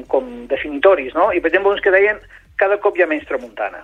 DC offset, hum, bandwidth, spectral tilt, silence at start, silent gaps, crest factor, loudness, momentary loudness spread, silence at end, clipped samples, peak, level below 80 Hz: under 0.1%; none; 4.5 kHz; -5.5 dB/octave; 0 s; none; 16 dB; -17 LUFS; 11 LU; 0 s; under 0.1%; 0 dBFS; -48 dBFS